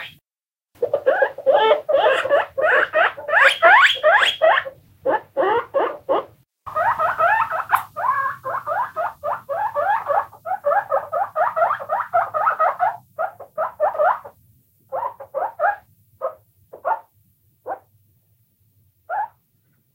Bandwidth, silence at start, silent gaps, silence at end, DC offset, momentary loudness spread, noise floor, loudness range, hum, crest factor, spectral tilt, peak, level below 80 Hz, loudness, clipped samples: 16 kHz; 0 s; none; 0.65 s; under 0.1%; 14 LU; under -90 dBFS; 13 LU; none; 20 dB; -2.5 dB/octave; 0 dBFS; -66 dBFS; -19 LUFS; under 0.1%